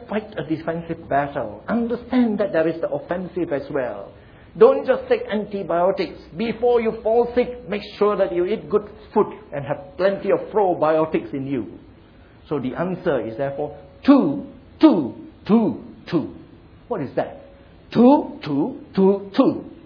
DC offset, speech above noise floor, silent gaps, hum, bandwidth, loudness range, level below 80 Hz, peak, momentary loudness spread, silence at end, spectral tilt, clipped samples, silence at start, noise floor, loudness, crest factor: under 0.1%; 27 dB; none; none; 5.4 kHz; 3 LU; -52 dBFS; 0 dBFS; 13 LU; 0.1 s; -9.5 dB/octave; under 0.1%; 0 s; -47 dBFS; -21 LUFS; 20 dB